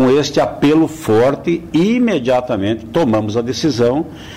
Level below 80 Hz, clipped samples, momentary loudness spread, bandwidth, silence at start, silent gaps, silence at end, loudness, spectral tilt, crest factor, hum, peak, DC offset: -44 dBFS; under 0.1%; 5 LU; 16 kHz; 0 s; none; 0 s; -15 LUFS; -6 dB/octave; 8 dB; none; -6 dBFS; under 0.1%